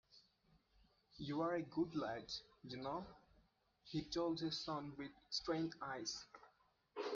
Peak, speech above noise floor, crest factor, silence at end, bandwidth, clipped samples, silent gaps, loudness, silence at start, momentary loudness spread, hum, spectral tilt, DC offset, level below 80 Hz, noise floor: -28 dBFS; 32 dB; 18 dB; 0 s; 7.4 kHz; under 0.1%; none; -45 LUFS; 0.1 s; 12 LU; none; -4.5 dB/octave; under 0.1%; -74 dBFS; -77 dBFS